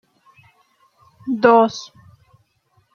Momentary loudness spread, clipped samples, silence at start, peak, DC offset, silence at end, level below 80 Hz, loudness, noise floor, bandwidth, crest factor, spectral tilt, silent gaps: 22 LU; under 0.1%; 1.25 s; -2 dBFS; under 0.1%; 1.1 s; -66 dBFS; -16 LUFS; -63 dBFS; 7 kHz; 20 dB; -5 dB/octave; none